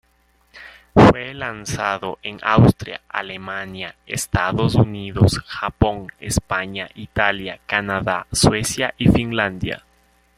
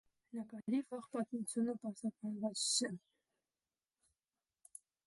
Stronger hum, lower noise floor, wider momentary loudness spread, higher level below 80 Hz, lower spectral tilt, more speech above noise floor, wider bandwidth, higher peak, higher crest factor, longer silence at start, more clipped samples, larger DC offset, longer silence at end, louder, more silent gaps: neither; second, -60 dBFS vs under -90 dBFS; second, 14 LU vs 17 LU; first, -38 dBFS vs -88 dBFS; first, -5 dB/octave vs -3 dB/octave; second, 40 dB vs over 49 dB; first, 16 kHz vs 11.5 kHz; first, 0 dBFS vs -22 dBFS; about the same, 20 dB vs 20 dB; first, 0.55 s vs 0.35 s; neither; neither; second, 0.6 s vs 2.1 s; first, -20 LUFS vs -40 LUFS; neither